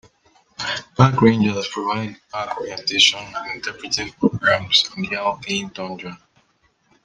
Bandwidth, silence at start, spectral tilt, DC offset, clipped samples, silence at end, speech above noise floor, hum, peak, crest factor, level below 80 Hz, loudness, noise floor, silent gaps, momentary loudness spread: 10 kHz; 0.6 s; -4 dB/octave; under 0.1%; under 0.1%; 0.9 s; 43 dB; none; -2 dBFS; 20 dB; -54 dBFS; -20 LUFS; -63 dBFS; none; 15 LU